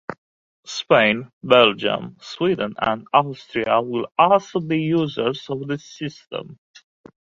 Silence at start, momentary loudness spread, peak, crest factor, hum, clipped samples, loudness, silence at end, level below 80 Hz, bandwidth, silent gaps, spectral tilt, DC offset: 0.1 s; 16 LU; 0 dBFS; 22 dB; none; under 0.1%; -20 LUFS; 0.85 s; -60 dBFS; 7.6 kHz; 0.18-0.63 s, 1.33-1.41 s; -5.5 dB/octave; under 0.1%